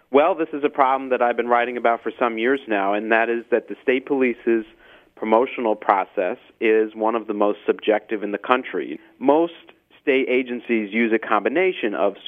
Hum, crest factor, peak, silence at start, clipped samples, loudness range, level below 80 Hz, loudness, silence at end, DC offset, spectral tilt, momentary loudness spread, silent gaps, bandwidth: none; 20 dB; 0 dBFS; 0.1 s; under 0.1%; 2 LU; -70 dBFS; -21 LUFS; 0.1 s; under 0.1%; -7.5 dB/octave; 6 LU; none; 4 kHz